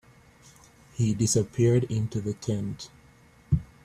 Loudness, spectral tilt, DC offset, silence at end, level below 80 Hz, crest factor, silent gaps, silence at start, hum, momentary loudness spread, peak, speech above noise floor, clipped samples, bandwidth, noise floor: -27 LUFS; -6 dB/octave; under 0.1%; 0.2 s; -48 dBFS; 18 dB; none; 1 s; none; 15 LU; -10 dBFS; 30 dB; under 0.1%; 14 kHz; -56 dBFS